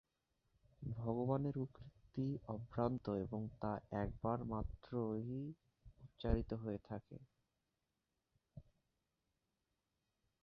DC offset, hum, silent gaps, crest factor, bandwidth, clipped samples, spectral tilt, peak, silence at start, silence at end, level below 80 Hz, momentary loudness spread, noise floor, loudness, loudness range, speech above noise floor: under 0.1%; none; none; 24 dB; 5.8 kHz; under 0.1%; -8.5 dB/octave; -22 dBFS; 0.8 s; 1.8 s; -56 dBFS; 22 LU; -89 dBFS; -44 LUFS; 5 LU; 47 dB